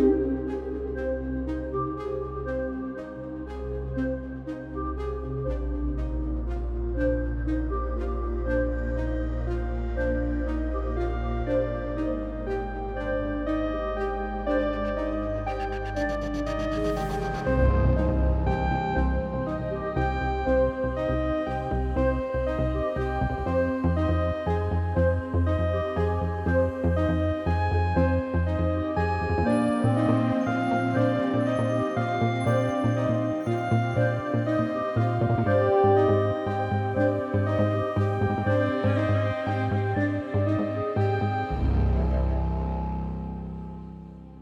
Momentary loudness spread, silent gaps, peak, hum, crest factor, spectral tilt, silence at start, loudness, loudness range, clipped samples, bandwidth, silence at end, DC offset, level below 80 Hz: 8 LU; none; -10 dBFS; none; 16 dB; -8.5 dB/octave; 0 s; -27 LUFS; 6 LU; under 0.1%; 10.5 kHz; 0 s; under 0.1%; -32 dBFS